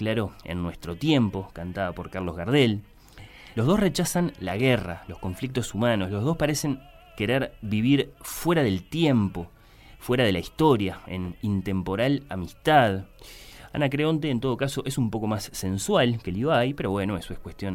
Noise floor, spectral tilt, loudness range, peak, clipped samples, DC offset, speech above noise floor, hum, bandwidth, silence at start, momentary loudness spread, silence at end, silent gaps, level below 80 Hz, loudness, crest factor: -47 dBFS; -5.5 dB/octave; 2 LU; -6 dBFS; under 0.1%; under 0.1%; 22 dB; none; 17 kHz; 0 s; 13 LU; 0 s; none; -48 dBFS; -26 LUFS; 20 dB